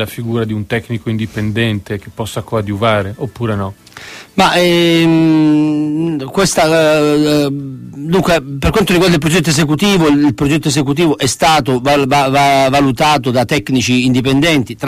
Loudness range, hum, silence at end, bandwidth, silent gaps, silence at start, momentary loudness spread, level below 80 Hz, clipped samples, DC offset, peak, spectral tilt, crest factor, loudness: 6 LU; none; 0 s; 15.5 kHz; none; 0 s; 11 LU; -36 dBFS; under 0.1%; under 0.1%; 0 dBFS; -5 dB/octave; 12 dB; -12 LUFS